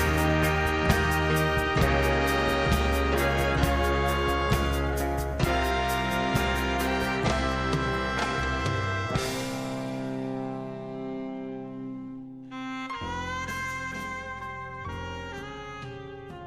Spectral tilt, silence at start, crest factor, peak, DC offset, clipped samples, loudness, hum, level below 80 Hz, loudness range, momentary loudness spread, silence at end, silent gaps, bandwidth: -5 dB/octave; 0 s; 20 dB; -8 dBFS; 0.1%; under 0.1%; -27 LUFS; none; -34 dBFS; 11 LU; 14 LU; 0 s; none; 15.5 kHz